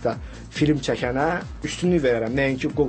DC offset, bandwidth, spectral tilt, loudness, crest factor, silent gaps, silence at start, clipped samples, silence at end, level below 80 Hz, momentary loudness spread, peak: under 0.1%; 8.8 kHz; -6 dB/octave; -23 LUFS; 14 dB; none; 0 s; under 0.1%; 0 s; -40 dBFS; 9 LU; -8 dBFS